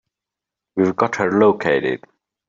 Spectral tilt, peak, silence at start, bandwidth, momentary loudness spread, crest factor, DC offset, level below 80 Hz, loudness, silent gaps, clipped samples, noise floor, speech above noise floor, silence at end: -6.5 dB/octave; -2 dBFS; 0.75 s; 7.6 kHz; 11 LU; 16 dB; under 0.1%; -62 dBFS; -18 LUFS; none; under 0.1%; -86 dBFS; 69 dB; 0.5 s